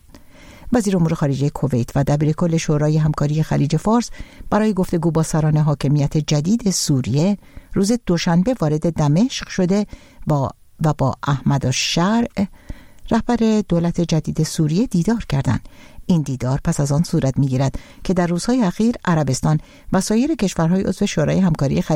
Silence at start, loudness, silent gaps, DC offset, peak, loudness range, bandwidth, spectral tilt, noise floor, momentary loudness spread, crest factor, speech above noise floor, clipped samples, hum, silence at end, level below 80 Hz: 0.15 s; -19 LUFS; none; 0.1%; -4 dBFS; 2 LU; 15.5 kHz; -6 dB/octave; -43 dBFS; 5 LU; 14 dB; 25 dB; under 0.1%; none; 0 s; -38 dBFS